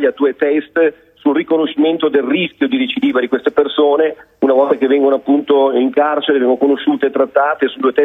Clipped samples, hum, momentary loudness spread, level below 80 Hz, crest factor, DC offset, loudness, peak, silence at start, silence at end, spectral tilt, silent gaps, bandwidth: under 0.1%; none; 4 LU; -62 dBFS; 12 dB; under 0.1%; -14 LUFS; 0 dBFS; 0 s; 0 s; -7.5 dB/octave; none; 4 kHz